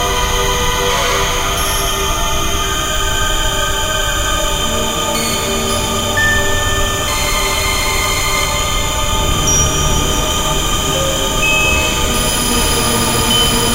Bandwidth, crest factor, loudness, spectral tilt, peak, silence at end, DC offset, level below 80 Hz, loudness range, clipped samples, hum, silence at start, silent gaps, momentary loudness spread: 16 kHz; 14 dB; -14 LUFS; -2 dB/octave; 0 dBFS; 0 s; under 0.1%; -22 dBFS; 2 LU; under 0.1%; none; 0 s; none; 4 LU